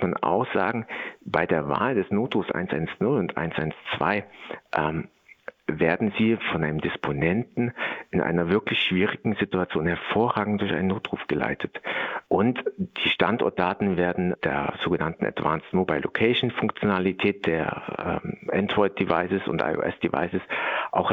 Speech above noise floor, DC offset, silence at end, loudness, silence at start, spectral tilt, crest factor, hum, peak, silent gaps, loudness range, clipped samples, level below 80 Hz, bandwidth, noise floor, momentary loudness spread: 20 dB; under 0.1%; 0 s; -25 LUFS; 0 s; -8.5 dB/octave; 20 dB; none; -4 dBFS; none; 2 LU; under 0.1%; -56 dBFS; 6.4 kHz; -45 dBFS; 7 LU